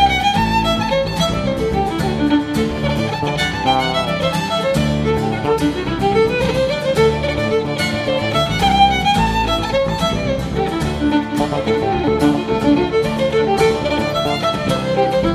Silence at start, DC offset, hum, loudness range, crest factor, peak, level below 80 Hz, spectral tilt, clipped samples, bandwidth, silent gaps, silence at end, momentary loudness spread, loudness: 0 s; under 0.1%; none; 2 LU; 14 dB; -2 dBFS; -32 dBFS; -5.5 dB/octave; under 0.1%; 15 kHz; none; 0 s; 4 LU; -17 LUFS